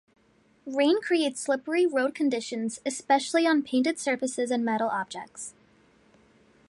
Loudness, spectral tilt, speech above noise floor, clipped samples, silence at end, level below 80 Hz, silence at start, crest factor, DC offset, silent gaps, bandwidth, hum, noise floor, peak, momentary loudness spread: -27 LUFS; -3 dB/octave; 37 dB; under 0.1%; 1.2 s; -76 dBFS; 0.65 s; 18 dB; under 0.1%; none; 11.5 kHz; none; -64 dBFS; -10 dBFS; 13 LU